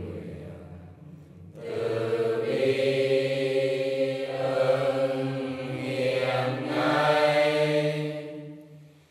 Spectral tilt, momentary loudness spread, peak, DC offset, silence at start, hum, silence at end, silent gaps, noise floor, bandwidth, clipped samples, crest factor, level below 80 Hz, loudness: -6 dB/octave; 19 LU; -10 dBFS; under 0.1%; 0 s; none; 0.25 s; none; -50 dBFS; 14.5 kHz; under 0.1%; 16 dB; -66 dBFS; -26 LUFS